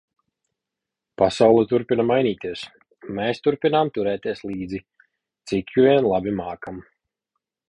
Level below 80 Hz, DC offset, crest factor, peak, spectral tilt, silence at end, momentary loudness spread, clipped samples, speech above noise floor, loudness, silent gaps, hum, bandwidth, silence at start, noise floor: -54 dBFS; under 0.1%; 20 dB; -2 dBFS; -6.5 dB/octave; 0.9 s; 17 LU; under 0.1%; 65 dB; -21 LUFS; none; none; 10.5 kHz; 1.2 s; -85 dBFS